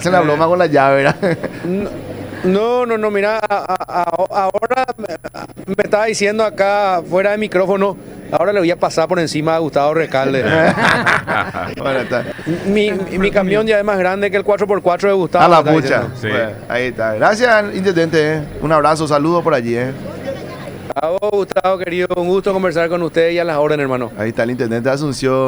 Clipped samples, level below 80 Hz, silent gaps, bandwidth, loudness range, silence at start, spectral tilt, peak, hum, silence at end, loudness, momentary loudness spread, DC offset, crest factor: under 0.1%; -44 dBFS; none; over 20 kHz; 4 LU; 0 s; -5.5 dB/octave; 0 dBFS; none; 0 s; -15 LUFS; 9 LU; under 0.1%; 14 dB